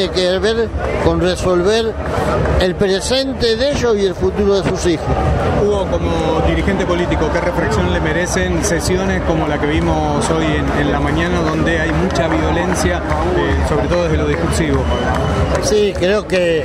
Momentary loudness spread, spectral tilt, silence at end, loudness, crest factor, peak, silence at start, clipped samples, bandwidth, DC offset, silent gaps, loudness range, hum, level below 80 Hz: 2 LU; -5.5 dB/octave; 0 s; -16 LUFS; 14 dB; 0 dBFS; 0 s; under 0.1%; 14.5 kHz; under 0.1%; none; 1 LU; none; -24 dBFS